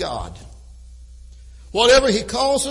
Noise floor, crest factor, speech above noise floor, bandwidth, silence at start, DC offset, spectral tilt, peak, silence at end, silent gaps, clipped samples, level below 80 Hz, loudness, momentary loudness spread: -41 dBFS; 18 dB; 23 dB; 11.5 kHz; 0 s; under 0.1%; -2.5 dB/octave; -2 dBFS; 0 s; none; under 0.1%; -38 dBFS; -17 LUFS; 17 LU